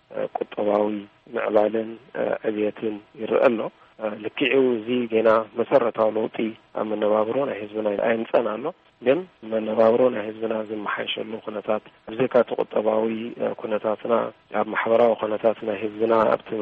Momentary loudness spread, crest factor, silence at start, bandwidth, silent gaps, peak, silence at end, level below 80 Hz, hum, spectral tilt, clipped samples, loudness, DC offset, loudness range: 11 LU; 18 dB; 0.1 s; 4.9 kHz; none; -6 dBFS; 0 s; -68 dBFS; none; -8 dB/octave; under 0.1%; -24 LUFS; under 0.1%; 3 LU